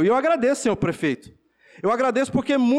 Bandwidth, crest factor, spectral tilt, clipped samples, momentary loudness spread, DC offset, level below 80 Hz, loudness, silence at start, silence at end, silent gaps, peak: 12.5 kHz; 10 dB; -5.5 dB/octave; under 0.1%; 7 LU; under 0.1%; -54 dBFS; -22 LUFS; 0 s; 0 s; none; -12 dBFS